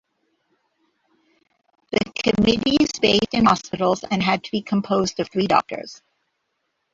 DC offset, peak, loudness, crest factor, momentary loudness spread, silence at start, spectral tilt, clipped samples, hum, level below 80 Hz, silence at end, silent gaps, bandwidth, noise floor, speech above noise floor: under 0.1%; -2 dBFS; -20 LUFS; 22 dB; 7 LU; 1.9 s; -5 dB/octave; under 0.1%; none; -50 dBFS; 1 s; none; 7.8 kHz; -74 dBFS; 54 dB